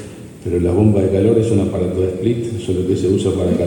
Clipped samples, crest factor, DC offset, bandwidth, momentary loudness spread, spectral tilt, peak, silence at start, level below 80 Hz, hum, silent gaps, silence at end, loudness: under 0.1%; 14 dB; under 0.1%; 17 kHz; 7 LU; -8 dB/octave; -2 dBFS; 0 s; -38 dBFS; none; none; 0 s; -17 LUFS